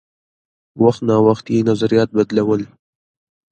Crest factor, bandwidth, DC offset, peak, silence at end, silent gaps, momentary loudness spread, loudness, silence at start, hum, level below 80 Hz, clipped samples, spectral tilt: 18 dB; 8.8 kHz; under 0.1%; 0 dBFS; 0.85 s; none; 5 LU; -16 LUFS; 0.75 s; none; -56 dBFS; under 0.1%; -7.5 dB/octave